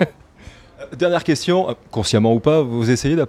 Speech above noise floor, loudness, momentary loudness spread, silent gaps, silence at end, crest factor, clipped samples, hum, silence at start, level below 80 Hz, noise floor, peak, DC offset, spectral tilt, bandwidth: 26 dB; -18 LUFS; 8 LU; none; 0 s; 16 dB; under 0.1%; none; 0 s; -46 dBFS; -43 dBFS; -2 dBFS; under 0.1%; -6 dB/octave; 14.5 kHz